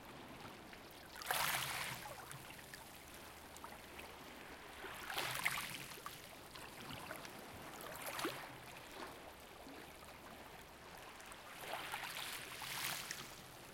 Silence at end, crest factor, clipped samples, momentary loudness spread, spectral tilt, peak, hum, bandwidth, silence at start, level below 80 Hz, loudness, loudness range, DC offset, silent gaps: 0 s; 26 dB; under 0.1%; 15 LU; -2 dB/octave; -22 dBFS; none; 17 kHz; 0 s; -70 dBFS; -47 LUFS; 7 LU; under 0.1%; none